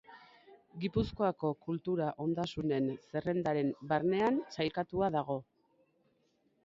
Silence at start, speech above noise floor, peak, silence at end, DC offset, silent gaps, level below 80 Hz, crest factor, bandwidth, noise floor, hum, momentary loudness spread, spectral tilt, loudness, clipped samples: 0.1 s; 41 dB; -16 dBFS; 1.2 s; under 0.1%; none; -60 dBFS; 18 dB; 7.6 kHz; -74 dBFS; none; 7 LU; -7.5 dB/octave; -34 LUFS; under 0.1%